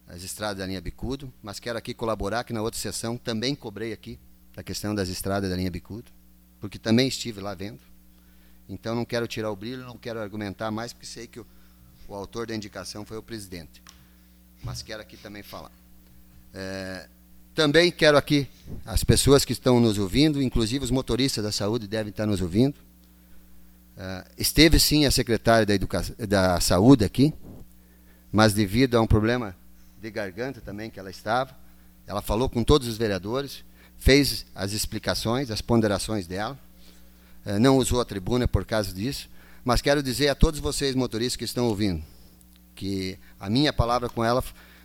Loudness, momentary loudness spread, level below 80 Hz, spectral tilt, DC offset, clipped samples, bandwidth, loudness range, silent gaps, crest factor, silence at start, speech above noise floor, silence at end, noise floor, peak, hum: -24 LUFS; 19 LU; -38 dBFS; -5 dB/octave; under 0.1%; under 0.1%; 18 kHz; 14 LU; none; 24 dB; 0.1 s; 29 dB; 0.3 s; -54 dBFS; -2 dBFS; none